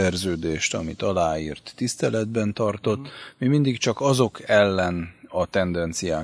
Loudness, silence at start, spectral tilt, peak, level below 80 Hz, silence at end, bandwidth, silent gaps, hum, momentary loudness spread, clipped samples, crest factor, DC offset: -24 LUFS; 0 s; -5 dB/octave; -4 dBFS; -48 dBFS; 0 s; 11 kHz; none; none; 9 LU; under 0.1%; 20 dB; under 0.1%